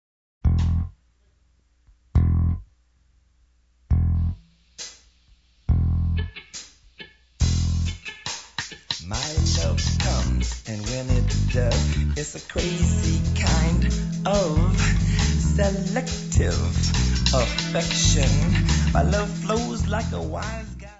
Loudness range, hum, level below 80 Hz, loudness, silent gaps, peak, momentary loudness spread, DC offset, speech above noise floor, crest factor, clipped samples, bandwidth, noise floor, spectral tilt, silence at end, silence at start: 7 LU; none; -28 dBFS; -23 LUFS; none; -2 dBFS; 12 LU; under 0.1%; 41 dB; 20 dB; under 0.1%; 8 kHz; -62 dBFS; -5 dB/octave; 0.05 s; 0.45 s